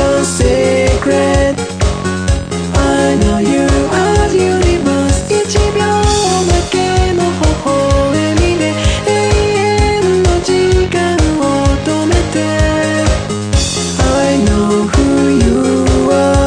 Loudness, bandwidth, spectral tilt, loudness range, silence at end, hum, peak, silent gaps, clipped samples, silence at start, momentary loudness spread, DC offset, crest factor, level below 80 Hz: -12 LUFS; 10.5 kHz; -5 dB/octave; 1 LU; 0 s; none; 0 dBFS; none; under 0.1%; 0 s; 3 LU; under 0.1%; 12 dB; -20 dBFS